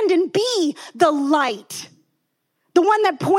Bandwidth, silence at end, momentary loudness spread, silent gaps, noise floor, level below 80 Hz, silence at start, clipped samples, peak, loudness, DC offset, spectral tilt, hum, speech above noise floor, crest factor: 15.5 kHz; 0 s; 12 LU; none; -72 dBFS; -76 dBFS; 0 s; under 0.1%; -4 dBFS; -19 LUFS; under 0.1%; -4 dB/octave; none; 54 dB; 16 dB